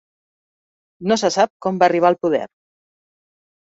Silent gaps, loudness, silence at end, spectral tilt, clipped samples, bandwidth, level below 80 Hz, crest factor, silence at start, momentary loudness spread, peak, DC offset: 1.50-1.60 s; -18 LUFS; 1.15 s; -4.5 dB/octave; under 0.1%; 8 kHz; -66 dBFS; 20 dB; 1 s; 10 LU; -2 dBFS; under 0.1%